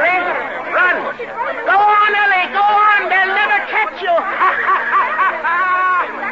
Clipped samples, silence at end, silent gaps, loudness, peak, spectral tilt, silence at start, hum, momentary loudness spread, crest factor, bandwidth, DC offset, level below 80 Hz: under 0.1%; 0 s; none; -14 LUFS; -4 dBFS; -3.5 dB/octave; 0 s; none; 8 LU; 12 dB; 7.8 kHz; 0.2%; -58 dBFS